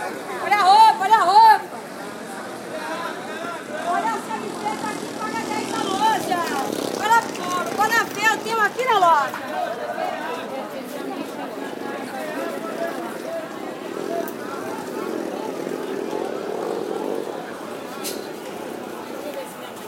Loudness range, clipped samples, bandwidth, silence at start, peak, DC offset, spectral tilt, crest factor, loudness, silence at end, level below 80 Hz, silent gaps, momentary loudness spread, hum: 10 LU; under 0.1%; 16.5 kHz; 0 s; -2 dBFS; under 0.1%; -3 dB/octave; 20 dB; -22 LUFS; 0 s; -74 dBFS; none; 16 LU; none